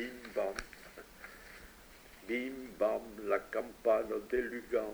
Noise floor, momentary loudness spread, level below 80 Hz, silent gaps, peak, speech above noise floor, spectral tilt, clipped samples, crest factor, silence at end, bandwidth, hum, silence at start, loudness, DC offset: -56 dBFS; 20 LU; -60 dBFS; none; -18 dBFS; 22 dB; -4.5 dB/octave; under 0.1%; 20 dB; 0 s; over 20 kHz; none; 0 s; -36 LUFS; under 0.1%